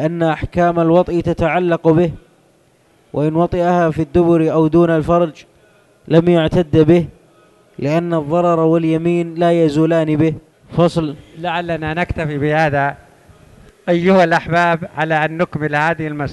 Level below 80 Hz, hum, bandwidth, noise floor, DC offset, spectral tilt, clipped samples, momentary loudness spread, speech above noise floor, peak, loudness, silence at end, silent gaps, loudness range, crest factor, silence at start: -40 dBFS; none; 10.5 kHz; -54 dBFS; under 0.1%; -8 dB/octave; under 0.1%; 8 LU; 39 dB; 0 dBFS; -15 LUFS; 0 s; none; 3 LU; 16 dB; 0 s